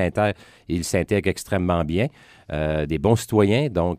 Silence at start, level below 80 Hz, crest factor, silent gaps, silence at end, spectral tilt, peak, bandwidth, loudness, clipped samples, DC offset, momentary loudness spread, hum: 0 s; -40 dBFS; 18 dB; none; 0 s; -6 dB/octave; -4 dBFS; 15.5 kHz; -22 LUFS; under 0.1%; under 0.1%; 9 LU; none